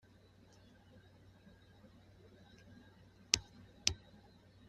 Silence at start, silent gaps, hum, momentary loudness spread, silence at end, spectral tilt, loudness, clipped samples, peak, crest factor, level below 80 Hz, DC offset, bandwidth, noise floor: 0.95 s; none; none; 28 LU; 0.7 s; -0.5 dB/octave; -37 LUFS; under 0.1%; -4 dBFS; 42 dB; -64 dBFS; under 0.1%; 13.5 kHz; -64 dBFS